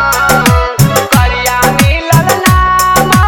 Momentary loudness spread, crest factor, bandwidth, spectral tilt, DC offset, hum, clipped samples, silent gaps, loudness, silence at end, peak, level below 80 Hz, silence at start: 2 LU; 8 dB; 19.5 kHz; -4.5 dB/octave; under 0.1%; none; 0.5%; none; -8 LUFS; 0 s; 0 dBFS; -18 dBFS; 0 s